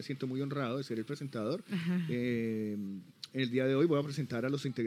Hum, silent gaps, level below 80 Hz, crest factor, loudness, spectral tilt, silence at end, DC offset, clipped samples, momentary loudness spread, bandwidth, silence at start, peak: none; none; -80 dBFS; 16 dB; -35 LUFS; -7 dB/octave; 0 s; under 0.1%; under 0.1%; 10 LU; 15 kHz; 0 s; -18 dBFS